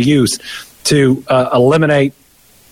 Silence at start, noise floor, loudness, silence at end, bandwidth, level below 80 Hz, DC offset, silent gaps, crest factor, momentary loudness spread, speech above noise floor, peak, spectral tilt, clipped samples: 0 s; -48 dBFS; -13 LUFS; 0.6 s; 16 kHz; -46 dBFS; under 0.1%; none; 12 dB; 9 LU; 36 dB; -2 dBFS; -5 dB/octave; under 0.1%